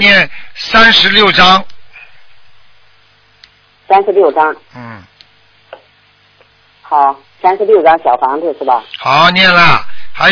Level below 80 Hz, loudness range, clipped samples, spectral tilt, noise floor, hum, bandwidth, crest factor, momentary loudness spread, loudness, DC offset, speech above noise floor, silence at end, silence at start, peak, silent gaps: -42 dBFS; 7 LU; 1%; -4 dB/octave; -49 dBFS; none; 5.4 kHz; 12 dB; 11 LU; -8 LUFS; under 0.1%; 40 dB; 0 s; 0 s; 0 dBFS; none